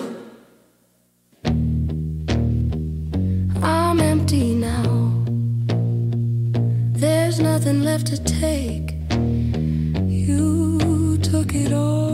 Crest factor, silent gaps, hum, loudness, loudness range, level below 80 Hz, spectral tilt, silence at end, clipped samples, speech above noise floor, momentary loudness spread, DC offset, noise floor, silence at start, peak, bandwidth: 16 dB; none; 60 Hz at -50 dBFS; -20 LUFS; 3 LU; -32 dBFS; -6.5 dB/octave; 0 s; under 0.1%; 41 dB; 6 LU; under 0.1%; -61 dBFS; 0 s; -4 dBFS; 15.5 kHz